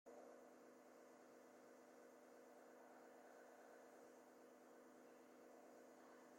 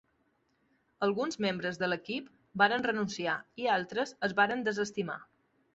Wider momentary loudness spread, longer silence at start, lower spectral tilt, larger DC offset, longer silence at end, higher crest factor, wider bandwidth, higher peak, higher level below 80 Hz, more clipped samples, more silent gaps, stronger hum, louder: second, 2 LU vs 11 LU; second, 0.05 s vs 1 s; about the same, -3.5 dB/octave vs -2.5 dB/octave; neither; second, 0 s vs 0.55 s; second, 14 dB vs 22 dB; first, 16.5 kHz vs 8 kHz; second, -52 dBFS vs -12 dBFS; second, under -90 dBFS vs -72 dBFS; neither; neither; neither; second, -66 LUFS vs -32 LUFS